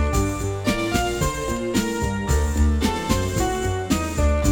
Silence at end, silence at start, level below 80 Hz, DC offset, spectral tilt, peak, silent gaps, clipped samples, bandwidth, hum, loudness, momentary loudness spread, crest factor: 0 s; 0 s; -26 dBFS; under 0.1%; -5 dB/octave; -6 dBFS; none; under 0.1%; 18.5 kHz; none; -23 LUFS; 4 LU; 14 dB